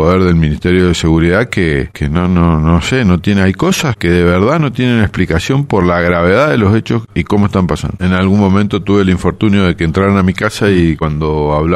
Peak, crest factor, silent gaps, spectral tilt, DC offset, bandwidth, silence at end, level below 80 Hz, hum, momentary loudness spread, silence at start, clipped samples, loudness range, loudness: 0 dBFS; 10 dB; none; -6.5 dB/octave; under 0.1%; 12.5 kHz; 0 s; -28 dBFS; none; 4 LU; 0 s; under 0.1%; 1 LU; -12 LUFS